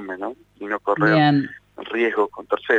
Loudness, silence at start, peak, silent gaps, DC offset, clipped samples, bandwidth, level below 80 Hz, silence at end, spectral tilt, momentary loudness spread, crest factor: -21 LUFS; 0 s; -6 dBFS; none; under 0.1%; under 0.1%; 7.4 kHz; -62 dBFS; 0 s; -8 dB/octave; 17 LU; 16 dB